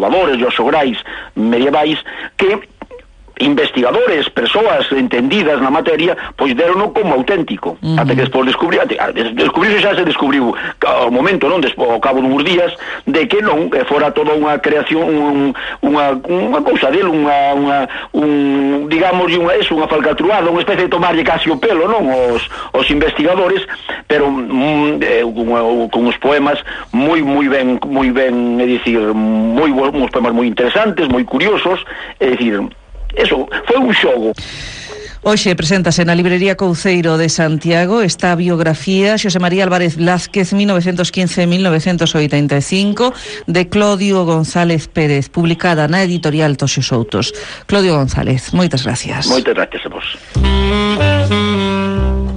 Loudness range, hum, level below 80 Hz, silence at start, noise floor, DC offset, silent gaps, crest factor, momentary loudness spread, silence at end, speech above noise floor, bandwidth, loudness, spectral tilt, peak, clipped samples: 2 LU; none; -32 dBFS; 0 s; -37 dBFS; under 0.1%; none; 12 dB; 5 LU; 0 s; 24 dB; 10 kHz; -13 LUFS; -5.5 dB/octave; -2 dBFS; under 0.1%